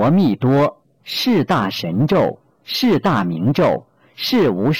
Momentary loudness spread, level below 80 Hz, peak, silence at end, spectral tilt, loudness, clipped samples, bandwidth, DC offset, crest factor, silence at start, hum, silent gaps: 9 LU; -52 dBFS; -10 dBFS; 0 s; -6.5 dB/octave; -17 LUFS; under 0.1%; 17 kHz; under 0.1%; 8 dB; 0 s; none; none